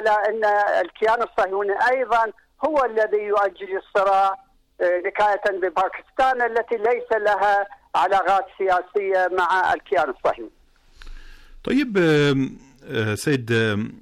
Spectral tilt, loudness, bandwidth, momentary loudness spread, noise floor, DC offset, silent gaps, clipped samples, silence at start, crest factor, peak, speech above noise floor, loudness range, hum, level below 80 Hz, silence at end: -5.5 dB/octave; -21 LUFS; 14.5 kHz; 7 LU; -47 dBFS; under 0.1%; none; under 0.1%; 0 s; 10 dB; -12 dBFS; 26 dB; 3 LU; none; -50 dBFS; 0 s